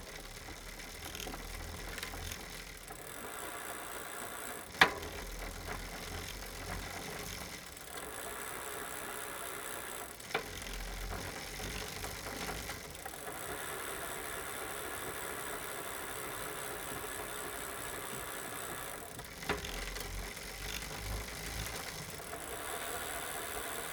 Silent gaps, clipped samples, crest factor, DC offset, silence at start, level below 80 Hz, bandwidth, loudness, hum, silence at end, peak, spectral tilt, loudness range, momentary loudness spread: none; under 0.1%; 34 dB; under 0.1%; 0 s; -52 dBFS; over 20 kHz; -40 LUFS; none; 0 s; -8 dBFS; -2 dB/octave; 6 LU; 5 LU